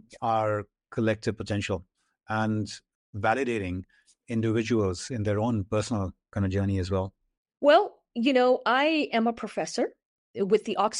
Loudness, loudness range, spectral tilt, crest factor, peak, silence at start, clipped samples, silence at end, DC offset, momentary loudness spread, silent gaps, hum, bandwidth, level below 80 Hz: -27 LUFS; 5 LU; -6 dB/octave; 18 dB; -8 dBFS; 0.1 s; under 0.1%; 0 s; under 0.1%; 11 LU; 2.95-3.13 s, 7.37-7.45 s, 10.05-10.34 s; none; 11 kHz; -58 dBFS